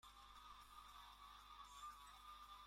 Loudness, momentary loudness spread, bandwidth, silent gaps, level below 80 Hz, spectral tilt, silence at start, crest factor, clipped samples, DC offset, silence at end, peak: -60 LUFS; 4 LU; 16.5 kHz; none; -72 dBFS; -1 dB/octave; 0.05 s; 14 dB; under 0.1%; under 0.1%; 0 s; -48 dBFS